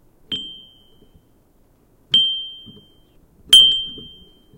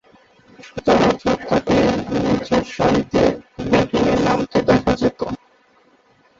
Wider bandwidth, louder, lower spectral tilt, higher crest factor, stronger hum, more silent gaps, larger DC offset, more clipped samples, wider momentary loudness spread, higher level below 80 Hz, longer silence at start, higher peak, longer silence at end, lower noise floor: first, 16.5 kHz vs 7.8 kHz; first, -13 LUFS vs -18 LUFS; second, 0.5 dB/octave vs -6 dB/octave; first, 22 dB vs 16 dB; neither; neither; neither; neither; first, 24 LU vs 9 LU; second, -54 dBFS vs -40 dBFS; second, 0.3 s vs 0.65 s; about the same, 0 dBFS vs -2 dBFS; second, 0.55 s vs 1.05 s; about the same, -56 dBFS vs -55 dBFS